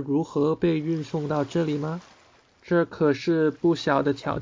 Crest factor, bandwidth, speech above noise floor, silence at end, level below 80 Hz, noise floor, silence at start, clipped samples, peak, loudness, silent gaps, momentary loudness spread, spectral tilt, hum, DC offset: 16 dB; 7.6 kHz; 33 dB; 0 s; -56 dBFS; -57 dBFS; 0 s; under 0.1%; -8 dBFS; -25 LUFS; none; 6 LU; -7.5 dB/octave; none; under 0.1%